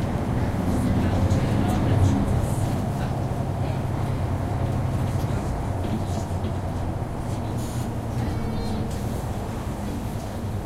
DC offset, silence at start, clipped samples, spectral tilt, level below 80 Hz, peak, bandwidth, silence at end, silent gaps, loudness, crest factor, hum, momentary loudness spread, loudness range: under 0.1%; 0 s; under 0.1%; -7.5 dB/octave; -34 dBFS; -8 dBFS; 15.5 kHz; 0 s; none; -26 LUFS; 16 dB; none; 8 LU; 5 LU